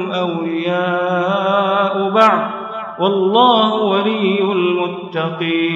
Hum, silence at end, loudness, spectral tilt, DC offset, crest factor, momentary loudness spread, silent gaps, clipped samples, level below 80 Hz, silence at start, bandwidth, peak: none; 0 s; -16 LUFS; -7 dB/octave; under 0.1%; 16 dB; 9 LU; none; under 0.1%; -70 dBFS; 0 s; 7.6 kHz; 0 dBFS